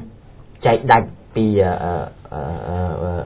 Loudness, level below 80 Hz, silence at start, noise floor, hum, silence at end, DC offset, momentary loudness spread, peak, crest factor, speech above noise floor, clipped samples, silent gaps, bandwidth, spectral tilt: -19 LUFS; -34 dBFS; 0 s; -42 dBFS; none; 0 s; under 0.1%; 13 LU; 0 dBFS; 20 dB; 24 dB; under 0.1%; none; 4 kHz; -11 dB/octave